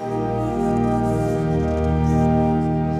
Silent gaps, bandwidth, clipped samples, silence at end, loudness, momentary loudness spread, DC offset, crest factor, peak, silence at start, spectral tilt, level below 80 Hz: none; 11.5 kHz; under 0.1%; 0 s; -20 LUFS; 4 LU; under 0.1%; 12 dB; -6 dBFS; 0 s; -9 dB/octave; -32 dBFS